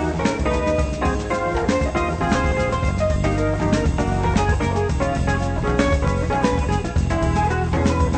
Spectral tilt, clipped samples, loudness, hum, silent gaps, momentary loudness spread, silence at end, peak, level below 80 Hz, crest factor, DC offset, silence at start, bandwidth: -6.5 dB/octave; under 0.1%; -21 LUFS; none; none; 2 LU; 0 s; -4 dBFS; -26 dBFS; 16 dB; under 0.1%; 0 s; 9 kHz